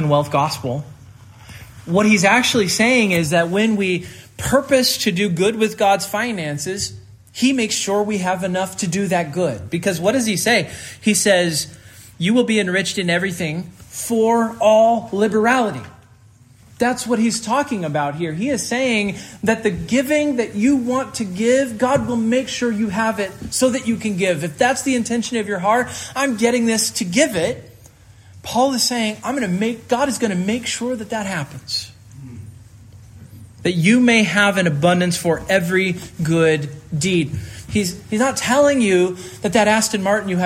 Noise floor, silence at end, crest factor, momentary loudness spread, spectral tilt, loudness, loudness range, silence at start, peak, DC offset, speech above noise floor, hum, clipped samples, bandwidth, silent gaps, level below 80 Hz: -48 dBFS; 0 s; 18 dB; 10 LU; -4 dB/octave; -18 LUFS; 4 LU; 0 s; -2 dBFS; under 0.1%; 30 dB; none; under 0.1%; 16 kHz; none; -52 dBFS